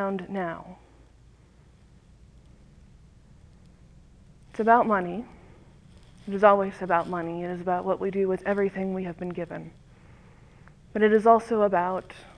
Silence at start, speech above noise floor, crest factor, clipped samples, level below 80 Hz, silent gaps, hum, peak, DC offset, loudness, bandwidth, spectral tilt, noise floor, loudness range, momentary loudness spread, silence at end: 0 s; 30 dB; 24 dB; under 0.1%; -56 dBFS; none; none; -4 dBFS; under 0.1%; -25 LUFS; 10 kHz; -7.5 dB/octave; -55 dBFS; 5 LU; 18 LU; 0.15 s